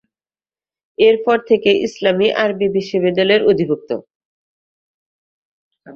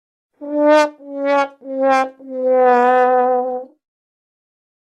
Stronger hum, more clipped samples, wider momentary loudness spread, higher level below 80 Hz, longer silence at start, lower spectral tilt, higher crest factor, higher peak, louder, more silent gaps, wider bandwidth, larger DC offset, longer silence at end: neither; neither; second, 8 LU vs 12 LU; first, -58 dBFS vs -74 dBFS; first, 1 s vs 0.4 s; first, -6 dB/octave vs -3 dB/octave; about the same, 18 dB vs 16 dB; about the same, 0 dBFS vs -2 dBFS; about the same, -15 LUFS vs -16 LUFS; first, 4.15-5.71 s vs none; second, 7 kHz vs 10 kHz; neither; second, 0 s vs 1.3 s